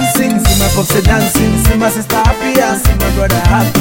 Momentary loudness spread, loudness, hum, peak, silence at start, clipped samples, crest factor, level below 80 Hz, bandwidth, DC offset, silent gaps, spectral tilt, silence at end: 2 LU; -11 LUFS; none; 0 dBFS; 0 s; under 0.1%; 10 dB; -16 dBFS; 17.5 kHz; under 0.1%; none; -4.5 dB/octave; 0 s